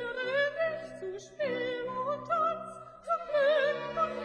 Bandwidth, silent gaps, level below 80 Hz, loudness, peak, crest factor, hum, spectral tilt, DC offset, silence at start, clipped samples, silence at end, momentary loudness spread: 10 kHz; none; -68 dBFS; -31 LUFS; -18 dBFS; 14 dB; none; -4.5 dB/octave; under 0.1%; 0 s; under 0.1%; 0 s; 14 LU